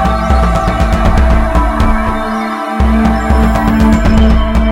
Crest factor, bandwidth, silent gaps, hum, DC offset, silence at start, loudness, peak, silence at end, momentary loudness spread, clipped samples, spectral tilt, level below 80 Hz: 10 dB; 12 kHz; none; none; under 0.1%; 0 s; -11 LUFS; 0 dBFS; 0 s; 5 LU; 0.2%; -7 dB/octave; -12 dBFS